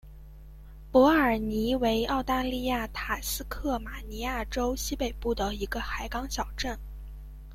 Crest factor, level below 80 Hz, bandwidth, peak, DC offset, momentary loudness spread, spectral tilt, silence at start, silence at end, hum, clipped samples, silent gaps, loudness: 20 dB; -40 dBFS; 16.5 kHz; -10 dBFS; under 0.1%; 12 LU; -4.5 dB/octave; 0.05 s; 0 s; none; under 0.1%; none; -29 LUFS